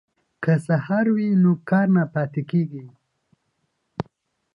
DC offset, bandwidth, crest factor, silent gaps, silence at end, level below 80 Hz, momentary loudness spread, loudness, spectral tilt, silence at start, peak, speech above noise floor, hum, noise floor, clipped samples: under 0.1%; 10.5 kHz; 16 dB; none; 0.55 s; -64 dBFS; 16 LU; -21 LUFS; -9.5 dB/octave; 0.4 s; -8 dBFS; 53 dB; none; -73 dBFS; under 0.1%